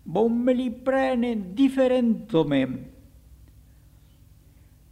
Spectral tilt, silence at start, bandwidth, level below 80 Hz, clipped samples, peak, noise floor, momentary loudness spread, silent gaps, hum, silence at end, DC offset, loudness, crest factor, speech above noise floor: -7.5 dB/octave; 0.05 s; 11.5 kHz; -54 dBFS; under 0.1%; -8 dBFS; -53 dBFS; 5 LU; none; 50 Hz at -60 dBFS; 2 s; under 0.1%; -23 LUFS; 18 dB; 31 dB